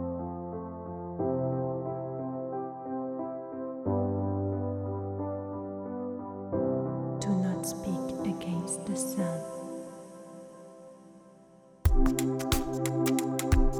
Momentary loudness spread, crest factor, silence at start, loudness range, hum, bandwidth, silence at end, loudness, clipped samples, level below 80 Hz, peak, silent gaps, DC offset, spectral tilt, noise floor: 13 LU; 20 dB; 0 s; 4 LU; none; 16 kHz; 0 s; -33 LUFS; under 0.1%; -38 dBFS; -12 dBFS; none; under 0.1%; -6 dB/octave; -56 dBFS